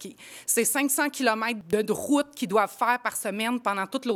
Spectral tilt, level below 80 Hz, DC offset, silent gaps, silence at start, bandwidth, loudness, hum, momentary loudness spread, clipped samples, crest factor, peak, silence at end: -2.5 dB/octave; -70 dBFS; under 0.1%; none; 0 s; 18.5 kHz; -26 LUFS; none; 6 LU; under 0.1%; 18 dB; -8 dBFS; 0 s